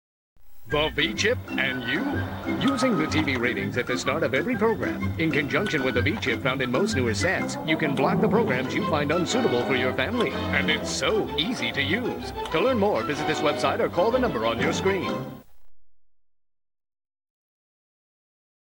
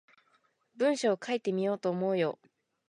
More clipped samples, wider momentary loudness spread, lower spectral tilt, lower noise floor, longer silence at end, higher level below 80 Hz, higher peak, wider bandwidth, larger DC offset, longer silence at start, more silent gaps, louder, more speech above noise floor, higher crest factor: neither; about the same, 4 LU vs 4 LU; about the same, -5 dB/octave vs -5.5 dB/octave; second, -50 dBFS vs -71 dBFS; first, 2.7 s vs 0.6 s; first, -50 dBFS vs -84 dBFS; first, -6 dBFS vs -16 dBFS; first, over 20 kHz vs 10.5 kHz; neither; second, 0.35 s vs 0.8 s; neither; first, -24 LUFS vs -31 LUFS; second, 25 dB vs 42 dB; about the same, 18 dB vs 16 dB